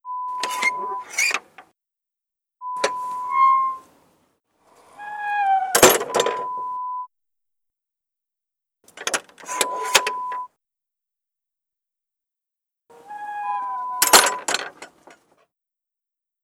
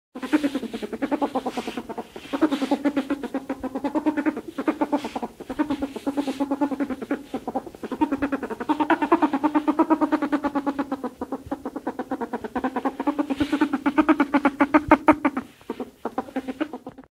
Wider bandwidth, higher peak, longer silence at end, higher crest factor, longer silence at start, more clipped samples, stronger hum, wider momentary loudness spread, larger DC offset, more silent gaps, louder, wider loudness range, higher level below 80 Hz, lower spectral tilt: first, over 20 kHz vs 14.5 kHz; about the same, 0 dBFS vs 0 dBFS; first, 1.55 s vs 0.1 s; about the same, 24 dB vs 24 dB; about the same, 0.05 s vs 0.15 s; neither; neither; first, 20 LU vs 12 LU; neither; neither; first, -20 LUFS vs -25 LUFS; first, 11 LU vs 6 LU; second, -64 dBFS vs -54 dBFS; second, -0.5 dB/octave vs -5.5 dB/octave